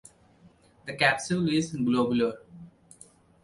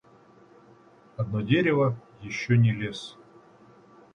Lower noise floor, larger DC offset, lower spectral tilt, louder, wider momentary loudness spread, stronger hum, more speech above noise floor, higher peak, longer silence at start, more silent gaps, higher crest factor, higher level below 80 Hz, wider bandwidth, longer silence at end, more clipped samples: about the same, -58 dBFS vs -56 dBFS; neither; second, -5 dB/octave vs -7 dB/octave; about the same, -26 LUFS vs -26 LUFS; about the same, 17 LU vs 17 LU; neither; about the same, 32 dB vs 31 dB; first, -6 dBFS vs -10 dBFS; second, 0.85 s vs 1.2 s; neither; about the same, 22 dB vs 18 dB; about the same, -62 dBFS vs -60 dBFS; first, 11.5 kHz vs 9.6 kHz; second, 0.75 s vs 1 s; neither